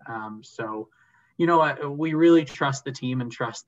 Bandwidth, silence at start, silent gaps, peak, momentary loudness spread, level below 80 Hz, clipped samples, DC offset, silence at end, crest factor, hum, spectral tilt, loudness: 7.8 kHz; 0.05 s; none; -8 dBFS; 17 LU; -70 dBFS; under 0.1%; under 0.1%; 0.05 s; 18 dB; none; -6 dB/octave; -23 LUFS